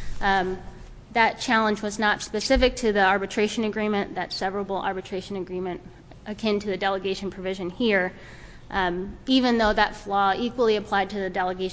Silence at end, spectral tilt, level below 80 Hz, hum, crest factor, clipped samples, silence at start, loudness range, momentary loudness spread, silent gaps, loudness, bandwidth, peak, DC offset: 0 s; -4.5 dB/octave; -42 dBFS; none; 20 dB; under 0.1%; 0 s; 6 LU; 11 LU; none; -24 LUFS; 8 kHz; -6 dBFS; under 0.1%